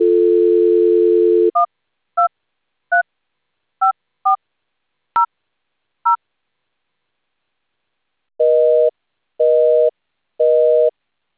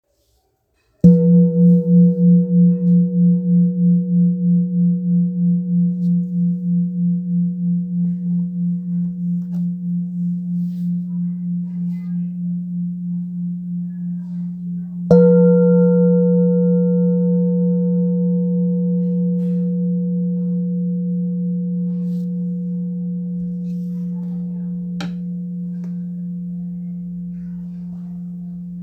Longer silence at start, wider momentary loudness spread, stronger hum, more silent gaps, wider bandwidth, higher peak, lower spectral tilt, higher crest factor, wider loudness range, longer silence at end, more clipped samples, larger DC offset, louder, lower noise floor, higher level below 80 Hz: second, 0 s vs 1.05 s; second, 9 LU vs 14 LU; neither; neither; first, 4 kHz vs 1.5 kHz; second, -6 dBFS vs 0 dBFS; second, -8 dB/octave vs -12.5 dB/octave; second, 10 dB vs 18 dB; about the same, 9 LU vs 11 LU; first, 0.5 s vs 0 s; neither; neither; about the same, -16 LUFS vs -18 LUFS; first, -76 dBFS vs -65 dBFS; second, -70 dBFS vs -54 dBFS